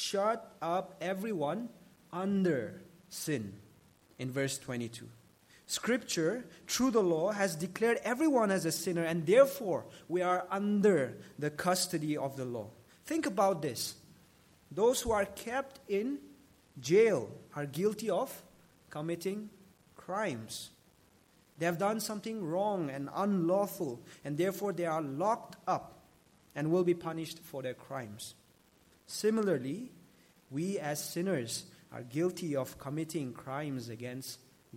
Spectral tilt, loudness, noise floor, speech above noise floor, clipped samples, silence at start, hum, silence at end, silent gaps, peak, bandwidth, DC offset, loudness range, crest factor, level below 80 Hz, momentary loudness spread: -5 dB/octave; -34 LUFS; -66 dBFS; 32 dB; under 0.1%; 0 s; none; 0 s; none; -12 dBFS; 16.5 kHz; under 0.1%; 7 LU; 22 dB; -70 dBFS; 15 LU